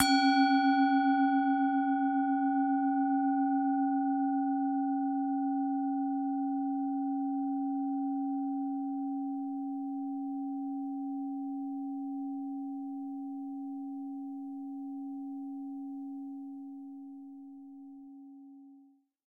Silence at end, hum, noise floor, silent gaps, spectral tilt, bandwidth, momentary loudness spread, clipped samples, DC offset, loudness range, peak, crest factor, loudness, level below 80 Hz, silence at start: 0.6 s; none; -62 dBFS; none; -2.5 dB/octave; 11 kHz; 18 LU; under 0.1%; under 0.1%; 14 LU; -10 dBFS; 22 dB; -32 LUFS; -78 dBFS; 0 s